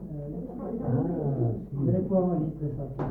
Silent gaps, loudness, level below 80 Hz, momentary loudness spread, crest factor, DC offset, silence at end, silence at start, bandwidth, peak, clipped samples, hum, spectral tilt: none; -29 LUFS; -48 dBFS; 11 LU; 14 dB; under 0.1%; 0 s; 0 s; 2.4 kHz; -14 dBFS; under 0.1%; none; -13 dB/octave